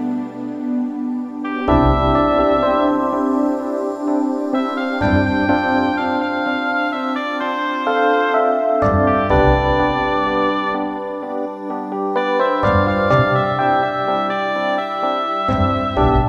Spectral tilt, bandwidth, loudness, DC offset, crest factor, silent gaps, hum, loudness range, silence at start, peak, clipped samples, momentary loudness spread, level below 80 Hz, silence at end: -8 dB/octave; 7.8 kHz; -18 LUFS; under 0.1%; 16 dB; none; none; 2 LU; 0 s; -2 dBFS; under 0.1%; 9 LU; -32 dBFS; 0 s